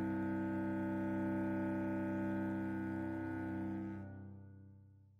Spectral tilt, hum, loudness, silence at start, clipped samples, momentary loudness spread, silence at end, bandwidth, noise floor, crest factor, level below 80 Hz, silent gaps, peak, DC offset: -9.5 dB/octave; none; -40 LUFS; 0 s; under 0.1%; 14 LU; 0.2 s; 4.9 kHz; -62 dBFS; 10 dB; -68 dBFS; none; -30 dBFS; under 0.1%